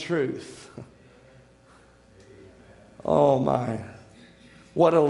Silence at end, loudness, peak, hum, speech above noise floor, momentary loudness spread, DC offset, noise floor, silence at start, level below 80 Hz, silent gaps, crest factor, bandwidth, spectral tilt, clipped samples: 0 s; -25 LUFS; -6 dBFS; none; 32 dB; 23 LU; under 0.1%; -55 dBFS; 0 s; -60 dBFS; none; 20 dB; 11.5 kHz; -7.5 dB/octave; under 0.1%